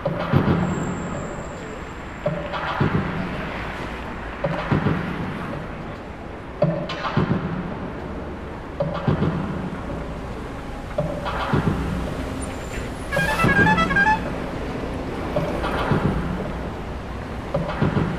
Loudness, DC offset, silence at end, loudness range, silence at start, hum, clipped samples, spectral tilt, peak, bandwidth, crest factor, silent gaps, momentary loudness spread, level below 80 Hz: -24 LUFS; under 0.1%; 0 s; 6 LU; 0 s; none; under 0.1%; -6.5 dB/octave; -4 dBFS; 14.5 kHz; 20 dB; none; 13 LU; -36 dBFS